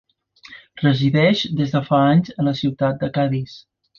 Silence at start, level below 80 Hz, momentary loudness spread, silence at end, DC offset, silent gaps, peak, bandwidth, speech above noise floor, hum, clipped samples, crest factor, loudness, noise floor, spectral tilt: 0.5 s; -54 dBFS; 7 LU; 0.4 s; under 0.1%; none; -2 dBFS; 7 kHz; 28 dB; none; under 0.1%; 16 dB; -19 LUFS; -46 dBFS; -7.5 dB/octave